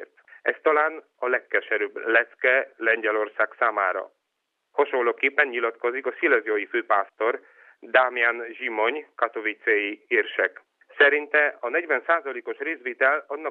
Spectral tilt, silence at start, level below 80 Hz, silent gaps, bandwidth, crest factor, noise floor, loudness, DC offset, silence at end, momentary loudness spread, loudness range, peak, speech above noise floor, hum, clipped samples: -4.5 dB/octave; 0 s; -88 dBFS; none; 4.2 kHz; 20 dB; -79 dBFS; -23 LUFS; under 0.1%; 0 s; 8 LU; 2 LU; -4 dBFS; 55 dB; none; under 0.1%